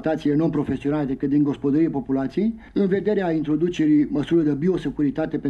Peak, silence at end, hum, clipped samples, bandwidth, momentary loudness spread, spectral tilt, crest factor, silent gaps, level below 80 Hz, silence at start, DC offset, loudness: -10 dBFS; 0 s; none; under 0.1%; 7.4 kHz; 5 LU; -8.5 dB/octave; 12 dB; none; -48 dBFS; 0 s; under 0.1%; -22 LUFS